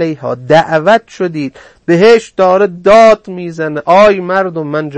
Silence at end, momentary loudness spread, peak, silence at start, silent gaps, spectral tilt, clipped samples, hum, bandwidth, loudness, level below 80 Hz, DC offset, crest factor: 0 s; 13 LU; 0 dBFS; 0 s; none; -6 dB/octave; 0.8%; none; 8.8 kHz; -9 LUFS; -46 dBFS; 0.5%; 10 dB